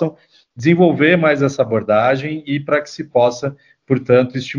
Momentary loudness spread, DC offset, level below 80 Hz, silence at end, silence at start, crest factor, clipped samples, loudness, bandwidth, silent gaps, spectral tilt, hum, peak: 10 LU; under 0.1%; -58 dBFS; 0 s; 0 s; 16 dB; under 0.1%; -16 LUFS; 7.4 kHz; none; -7 dB/octave; none; 0 dBFS